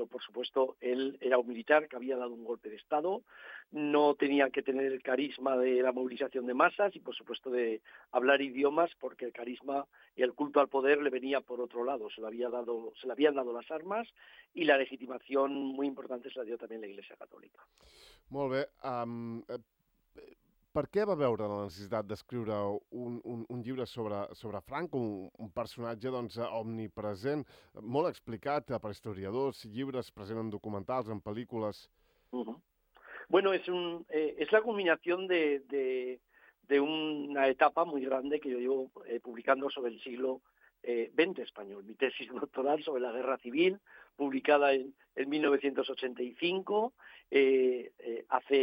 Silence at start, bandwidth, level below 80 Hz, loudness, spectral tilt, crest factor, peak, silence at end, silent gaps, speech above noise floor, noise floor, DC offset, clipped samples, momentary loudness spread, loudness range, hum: 0 s; 9.6 kHz; -74 dBFS; -33 LUFS; -6.5 dB/octave; 22 dB; -12 dBFS; 0 s; none; 20 dB; -53 dBFS; under 0.1%; under 0.1%; 14 LU; 8 LU; none